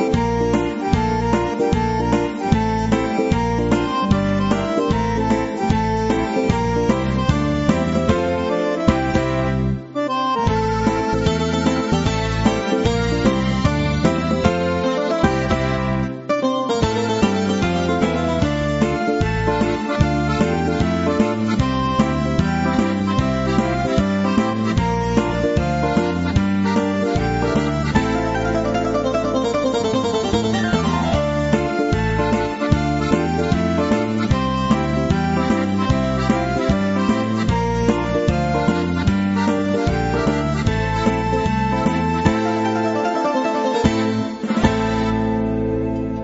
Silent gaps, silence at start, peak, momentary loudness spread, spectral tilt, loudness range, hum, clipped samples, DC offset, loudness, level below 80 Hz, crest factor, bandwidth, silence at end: none; 0 s; 0 dBFS; 2 LU; -6.5 dB/octave; 1 LU; none; under 0.1%; under 0.1%; -19 LUFS; -32 dBFS; 18 dB; 8 kHz; 0 s